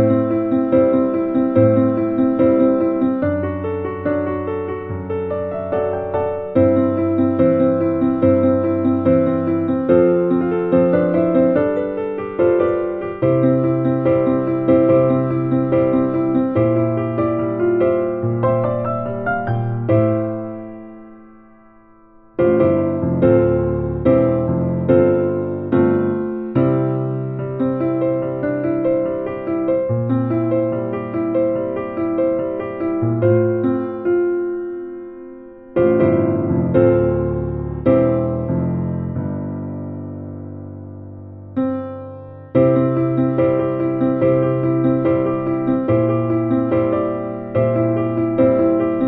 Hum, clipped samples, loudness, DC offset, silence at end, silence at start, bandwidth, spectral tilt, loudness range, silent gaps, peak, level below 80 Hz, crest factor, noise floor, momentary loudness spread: none; under 0.1%; -18 LUFS; under 0.1%; 0 s; 0 s; 4 kHz; -12.5 dB/octave; 5 LU; none; -2 dBFS; -46 dBFS; 16 dB; -48 dBFS; 10 LU